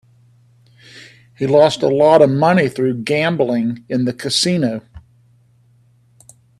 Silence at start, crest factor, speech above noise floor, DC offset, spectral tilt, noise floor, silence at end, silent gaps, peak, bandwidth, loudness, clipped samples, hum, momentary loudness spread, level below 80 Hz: 0.95 s; 18 dB; 39 dB; under 0.1%; -5.5 dB/octave; -53 dBFS; 1.6 s; none; 0 dBFS; 13 kHz; -15 LUFS; under 0.1%; none; 9 LU; -56 dBFS